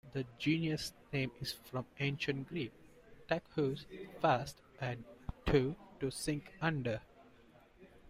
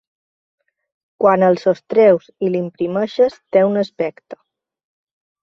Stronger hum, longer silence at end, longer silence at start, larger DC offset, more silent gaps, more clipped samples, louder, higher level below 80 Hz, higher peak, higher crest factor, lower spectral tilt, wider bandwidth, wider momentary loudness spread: neither; second, 0 s vs 1.1 s; second, 0.05 s vs 1.2 s; neither; neither; neither; second, -38 LUFS vs -17 LUFS; first, -56 dBFS vs -62 dBFS; second, -18 dBFS vs -2 dBFS; about the same, 20 dB vs 18 dB; second, -5.5 dB/octave vs -8 dB/octave; first, 16 kHz vs 7 kHz; about the same, 11 LU vs 9 LU